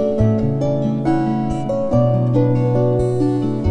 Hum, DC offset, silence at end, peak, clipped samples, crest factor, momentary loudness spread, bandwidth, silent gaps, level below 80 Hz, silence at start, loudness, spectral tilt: none; under 0.1%; 0 s; -4 dBFS; under 0.1%; 12 dB; 4 LU; 9.4 kHz; none; -36 dBFS; 0 s; -18 LUFS; -9.5 dB/octave